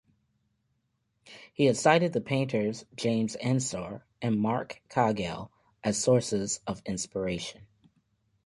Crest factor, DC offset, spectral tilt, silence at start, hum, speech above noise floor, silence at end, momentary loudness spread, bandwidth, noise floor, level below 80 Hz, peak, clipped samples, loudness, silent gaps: 22 dB; under 0.1%; -5 dB/octave; 1.25 s; none; 48 dB; 0.8 s; 12 LU; 11.5 kHz; -76 dBFS; -60 dBFS; -8 dBFS; under 0.1%; -29 LUFS; none